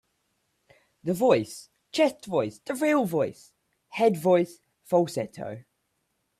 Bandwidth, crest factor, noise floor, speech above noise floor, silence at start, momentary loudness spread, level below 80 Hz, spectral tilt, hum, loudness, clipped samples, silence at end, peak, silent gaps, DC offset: 15 kHz; 20 dB; -76 dBFS; 51 dB; 1.05 s; 16 LU; -70 dBFS; -5.5 dB/octave; none; -26 LUFS; under 0.1%; 0.8 s; -8 dBFS; none; under 0.1%